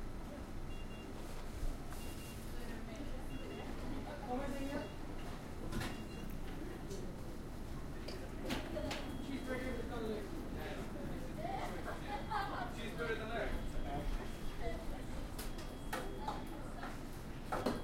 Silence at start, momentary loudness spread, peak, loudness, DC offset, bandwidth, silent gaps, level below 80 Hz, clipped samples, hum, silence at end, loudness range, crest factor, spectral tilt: 0 s; 7 LU; -20 dBFS; -45 LUFS; under 0.1%; 16 kHz; none; -46 dBFS; under 0.1%; none; 0 s; 4 LU; 22 dB; -5.5 dB/octave